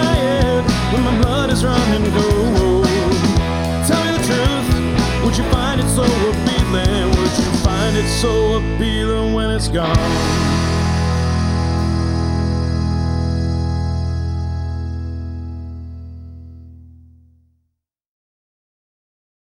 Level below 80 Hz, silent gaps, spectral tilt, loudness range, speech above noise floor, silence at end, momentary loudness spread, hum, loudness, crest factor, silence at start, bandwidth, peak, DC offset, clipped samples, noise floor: -24 dBFS; none; -5.5 dB/octave; 11 LU; 57 dB; 2.6 s; 10 LU; none; -17 LUFS; 14 dB; 0 s; 16.5 kHz; -2 dBFS; under 0.1%; under 0.1%; -73 dBFS